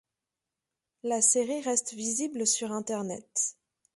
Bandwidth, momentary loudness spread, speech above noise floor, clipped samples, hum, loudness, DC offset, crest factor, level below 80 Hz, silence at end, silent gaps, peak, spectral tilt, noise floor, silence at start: 11.5 kHz; 10 LU; 59 dB; under 0.1%; none; -28 LUFS; under 0.1%; 20 dB; -78 dBFS; 0.45 s; none; -10 dBFS; -2.5 dB/octave; -89 dBFS; 1.05 s